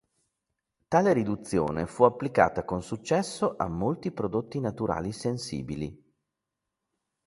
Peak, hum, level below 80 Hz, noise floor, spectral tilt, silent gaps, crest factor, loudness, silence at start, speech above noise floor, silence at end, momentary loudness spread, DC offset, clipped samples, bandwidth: -4 dBFS; none; -54 dBFS; -86 dBFS; -6.5 dB/octave; none; 24 dB; -28 LUFS; 0.9 s; 58 dB; 1.3 s; 10 LU; under 0.1%; under 0.1%; 11.5 kHz